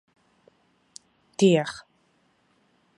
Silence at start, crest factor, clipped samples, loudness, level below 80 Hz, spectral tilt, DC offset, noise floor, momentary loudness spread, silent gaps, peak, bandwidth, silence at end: 1.4 s; 22 dB; under 0.1%; -23 LUFS; -72 dBFS; -5.5 dB/octave; under 0.1%; -67 dBFS; 28 LU; none; -8 dBFS; 11.5 kHz; 1.2 s